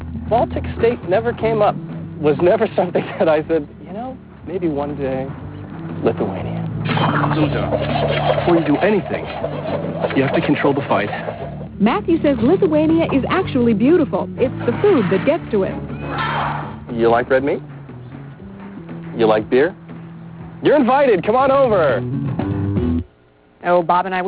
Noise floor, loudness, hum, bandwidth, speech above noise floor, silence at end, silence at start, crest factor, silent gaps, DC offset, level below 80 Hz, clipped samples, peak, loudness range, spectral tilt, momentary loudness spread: -51 dBFS; -18 LUFS; none; 4 kHz; 35 dB; 0 s; 0 s; 16 dB; none; under 0.1%; -40 dBFS; under 0.1%; -2 dBFS; 5 LU; -11 dB/octave; 16 LU